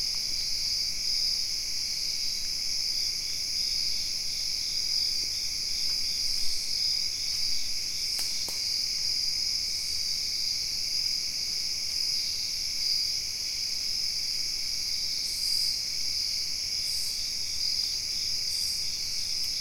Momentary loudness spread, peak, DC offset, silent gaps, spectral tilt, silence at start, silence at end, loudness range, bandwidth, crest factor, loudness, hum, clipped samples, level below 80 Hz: 3 LU; -14 dBFS; 0.7%; none; 1.5 dB/octave; 0 s; 0 s; 1 LU; 16.5 kHz; 16 dB; -27 LUFS; none; under 0.1%; -50 dBFS